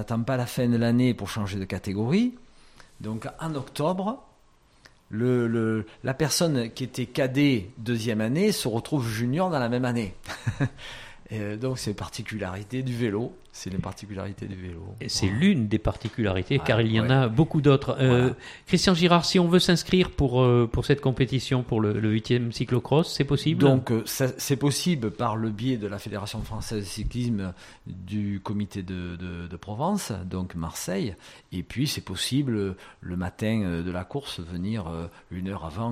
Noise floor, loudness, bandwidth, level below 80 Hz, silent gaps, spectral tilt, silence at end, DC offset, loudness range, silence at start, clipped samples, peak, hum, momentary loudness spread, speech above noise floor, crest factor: -59 dBFS; -26 LUFS; 16 kHz; -46 dBFS; none; -6 dB/octave; 0 s; under 0.1%; 10 LU; 0 s; under 0.1%; -4 dBFS; none; 14 LU; 33 dB; 22 dB